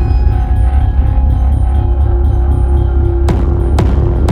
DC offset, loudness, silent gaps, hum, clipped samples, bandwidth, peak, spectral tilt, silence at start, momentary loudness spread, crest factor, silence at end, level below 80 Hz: under 0.1%; -13 LUFS; none; none; under 0.1%; 5 kHz; 0 dBFS; -9 dB/octave; 0 s; 1 LU; 10 dB; 0 s; -10 dBFS